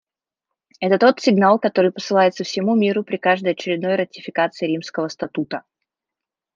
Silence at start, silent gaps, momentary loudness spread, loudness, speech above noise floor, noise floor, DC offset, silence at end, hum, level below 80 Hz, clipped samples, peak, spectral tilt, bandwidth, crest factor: 0.8 s; none; 11 LU; -19 LUFS; 68 dB; -87 dBFS; under 0.1%; 0.95 s; none; -70 dBFS; under 0.1%; -2 dBFS; -5.5 dB/octave; 7.6 kHz; 18 dB